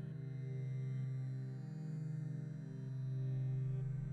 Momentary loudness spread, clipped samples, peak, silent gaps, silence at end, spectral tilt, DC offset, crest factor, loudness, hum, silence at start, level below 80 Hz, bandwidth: 6 LU; under 0.1%; -32 dBFS; none; 0 s; -9.5 dB/octave; under 0.1%; 8 dB; -43 LUFS; none; 0 s; -64 dBFS; 4.3 kHz